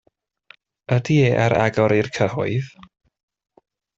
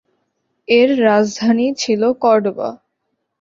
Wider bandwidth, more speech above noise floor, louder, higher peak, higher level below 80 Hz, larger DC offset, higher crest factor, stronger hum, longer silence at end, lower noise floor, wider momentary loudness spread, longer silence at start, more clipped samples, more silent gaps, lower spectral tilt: about the same, 7.8 kHz vs 7.6 kHz; second, 34 dB vs 58 dB; second, -19 LUFS vs -15 LUFS; about the same, -4 dBFS vs -2 dBFS; first, -54 dBFS vs -62 dBFS; neither; about the same, 18 dB vs 16 dB; neither; first, 1.3 s vs 0.65 s; second, -53 dBFS vs -72 dBFS; about the same, 8 LU vs 9 LU; first, 0.9 s vs 0.7 s; neither; neither; first, -7 dB/octave vs -4.5 dB/octave